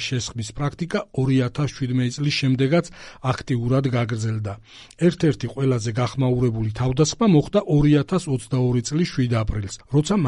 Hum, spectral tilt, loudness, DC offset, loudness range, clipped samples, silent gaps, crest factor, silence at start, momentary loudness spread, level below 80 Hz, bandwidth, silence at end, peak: none; -6.5 dB/octave; -22 LUFS; under 0.1%; 3 LU; under 0.1%; none; 16 dB; 0 s; 9 LU; -42 dBFS; 11 kHz; 0 s; -6 dBFS